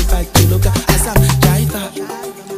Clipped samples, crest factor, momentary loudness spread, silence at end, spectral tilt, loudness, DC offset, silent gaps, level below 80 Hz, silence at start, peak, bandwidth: under 0.1%; 14 dB; 13 LU; 0 s; -5 dB/octave; -13 LUFS; under 0.1%; none; -20 dBFS; 0 s; 0 dBFS; 16 kHz